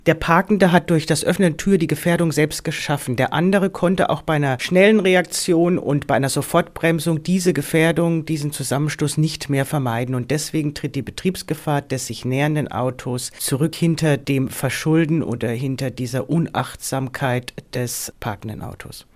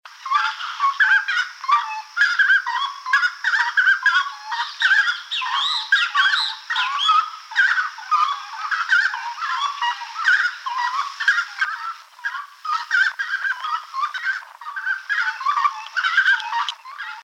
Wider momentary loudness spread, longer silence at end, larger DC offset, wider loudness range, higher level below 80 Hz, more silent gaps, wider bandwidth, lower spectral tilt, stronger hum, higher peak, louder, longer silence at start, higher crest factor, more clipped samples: about the same, 9 LU vs 10 LU; first, 0.15 s vs 0 s; neither; about the same, 5 LU vs 5 LU; first, -48 dBFS vs under -90 dBFS; neither; about the same, 16 kHz vs 15 kHz; first, -5.5 dB/octave vs 10.5 dB/octave; neither; first, 0 dBFS vs -6 dBFS; about the same, -20 LUFS vs -20 LUFS; about the same, 0.05 s vs 0.05 s; about the same, 18 dB vs 16 dB; neither